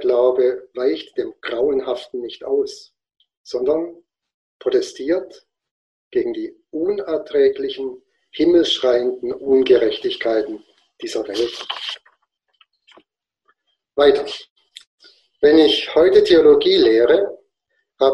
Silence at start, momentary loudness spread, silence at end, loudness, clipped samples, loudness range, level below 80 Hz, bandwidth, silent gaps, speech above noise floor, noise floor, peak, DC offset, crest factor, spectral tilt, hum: 0 s; 16 LU; 0 s; -18 LUFS; under 0.1%; 10 LU; -56 dBFS; 9.8 kHz; 3.37-3.44 s, 4.34-4.60 s, 5.71-6.11 s, 14.50-14.56 s, 14.87-14.98 s; 54 dB; -71 dBFS; 0 dBFS; under 0.1%; 18 dB; -4.5 dB/octave; none